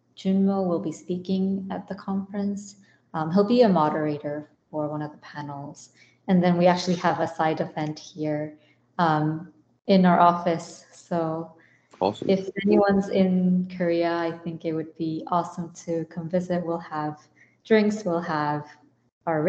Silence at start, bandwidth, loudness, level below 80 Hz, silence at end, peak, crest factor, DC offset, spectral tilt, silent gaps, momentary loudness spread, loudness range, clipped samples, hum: 0.2 s; 8.2 kHz; -25 LUFS; -66 dBFS; 0 s; -4 dBFS; 20 dB; under 0.1%; -7 dB/octave; 19.12-19.21 s; 16 LU; 4 LU; under 0.1%; none